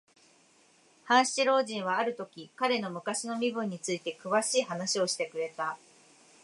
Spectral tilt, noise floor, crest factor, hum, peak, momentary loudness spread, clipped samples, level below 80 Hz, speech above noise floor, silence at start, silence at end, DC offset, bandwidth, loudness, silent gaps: -2.5 dB/octave; -63 dBFS; 22 dB; none; -8 dBFS; 10 LU; under 0.1%; -86 dBFS; 33 dB; 1.05 s; 0.7 s; under 0.1%; 11.5 kHz; -30 LUFS; none